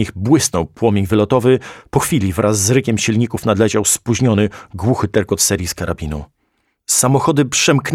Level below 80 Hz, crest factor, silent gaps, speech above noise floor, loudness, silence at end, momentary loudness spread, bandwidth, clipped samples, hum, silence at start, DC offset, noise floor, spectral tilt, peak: -40 dBFS; 16 dB; none; 50 dB; -15 LUFS; 0 s; 8 LU; 16.5 kHz; under 0.1%; none; 0 s; under 0.1%; -66 dBFS; -4.5 dB/octave; 0 dBFS